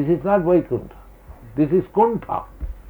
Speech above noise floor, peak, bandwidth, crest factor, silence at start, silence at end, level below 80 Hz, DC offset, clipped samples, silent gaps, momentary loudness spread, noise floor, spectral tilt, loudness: 23 dB; -6 dBFS; over 20 kHz; 16 dB; 0 s; 0 s; -40 dBFS; under 0.1%; under 0.1%; none; 11 LU; -42 dBFS; -10.5 dB/octave; -20 LUFS